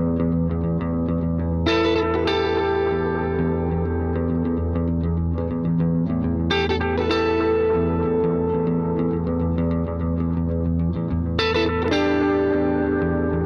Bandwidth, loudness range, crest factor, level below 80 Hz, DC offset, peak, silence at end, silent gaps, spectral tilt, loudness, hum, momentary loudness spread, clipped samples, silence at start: 6.8 kHz; 2 LU; 14 dB; -34 dBFS; under 0.1%; -6 dBFS; 0 s; none; -8 dB/octave; -22 LUFS; none; 4 LU; under 0.1%; 0 s